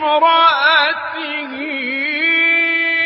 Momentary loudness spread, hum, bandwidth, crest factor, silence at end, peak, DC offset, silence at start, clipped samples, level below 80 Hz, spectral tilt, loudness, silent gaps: 12 LU; none; 5.8 kHz; 14 dB; 0 s; -2 dBFS; under 0.1%; 0 s; under 0.1%; -64 dBFS; -6 dB/octave; -14 LUFS; none